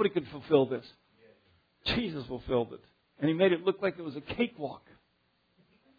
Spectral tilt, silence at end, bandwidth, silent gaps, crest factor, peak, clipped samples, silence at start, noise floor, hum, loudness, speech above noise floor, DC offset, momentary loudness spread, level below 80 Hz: -8 dB/octave; 1.2 s; 5 kHz; none; 22 dB; -12 dBFS; under 0.1%; 0 s; -73 dBFS; none; -31 LUFS; 42 dB; under 0.1%; 14 LU; -58 dBFS